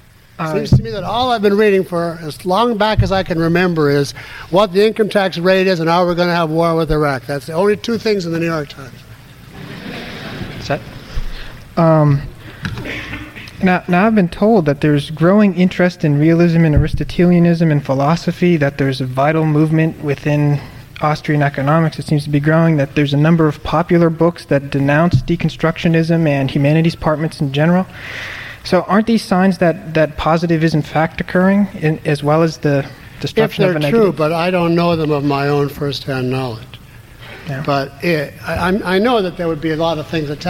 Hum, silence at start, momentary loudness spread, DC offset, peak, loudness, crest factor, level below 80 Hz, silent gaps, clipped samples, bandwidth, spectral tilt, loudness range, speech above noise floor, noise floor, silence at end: none; 0.4 s; 13 LU; under 0.1%; -2 dBFS; -15 LUFS; 14 dB; -34 dBFS; none; under 0.1%; 15.5 kHz; -7.5 dB/octave; 6 LU; 23 dB; -37 dBFS; 0 s